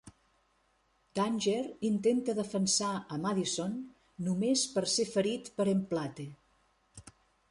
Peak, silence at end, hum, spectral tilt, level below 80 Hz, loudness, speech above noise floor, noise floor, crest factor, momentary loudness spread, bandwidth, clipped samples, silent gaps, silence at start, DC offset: -18 dBFS; 0.4 s; none; -4 dB/octave; -70 dBFS; -32 LUFS; 41 dB; -72 dBFS; 16 dB; 11 LU; 11.5 kHz; under 0.1%; none; 0.05 s; under 0.1%